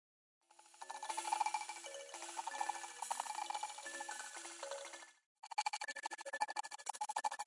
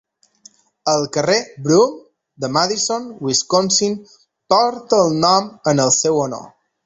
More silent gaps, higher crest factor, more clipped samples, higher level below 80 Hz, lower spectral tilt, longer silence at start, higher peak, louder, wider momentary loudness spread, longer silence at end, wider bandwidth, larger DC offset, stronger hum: first, 5.26-5.43 s vs none; first, 22 dB vs 16 dB; neither; second, under -90 dBFS vs -58 dBFS; second, 2.5 dB/octave vs -3.5 dB/octave; second, 0.5 s vs 0.85 s; second, -24 dBFS vs -2 dBFS; second, -44 LUFS vs -17 LUFS; about the same, 10 LU vs 9 LU; second, 0 s vs 0.4 s; first, 11.5 kHz vs 8.2 kHz; neither; neither